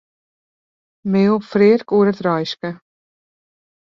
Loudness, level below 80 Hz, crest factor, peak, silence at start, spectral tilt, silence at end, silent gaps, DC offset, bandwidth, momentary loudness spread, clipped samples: -16 LUFS; -62 dBFS; 16 dB; -2 dBFS; 1.05 s; -8 dB/octave; 1.05 s; none; under 0.1%; 7 kHz; 14 LU; under 0.1%